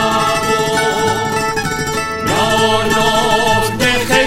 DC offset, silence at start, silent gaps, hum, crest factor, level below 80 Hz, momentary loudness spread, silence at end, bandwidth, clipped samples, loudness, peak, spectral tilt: under 0.1%; 0 s; none; none; 14 dB; -34 dBFS; 5 LU; 0 s; 17 kHz; under 0.1%; -14 LUFS; 0 dBFS; -3.5 dB/octave